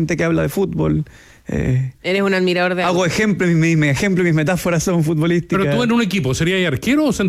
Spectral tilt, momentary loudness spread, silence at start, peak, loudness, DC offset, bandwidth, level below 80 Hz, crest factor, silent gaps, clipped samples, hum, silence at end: -6 dB/octave; 4 LU; 0 s; -6 dBFS; -17 LUFS; under 0.1%; 15.5 kHz; -40 dBFS; 10 dB; none; under 0.1%; none; 0 s